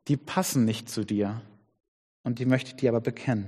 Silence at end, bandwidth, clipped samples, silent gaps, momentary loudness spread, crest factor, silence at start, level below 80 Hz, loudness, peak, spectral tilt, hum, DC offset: 0 s; 15 kHz; under 0.1%; 1.88-2.24 s; 8 LU; 20 dB; 0.05 s; -66 dBFS; -28 LUFS; -8 dBFS; -6 dB/octave; none; under 0.1%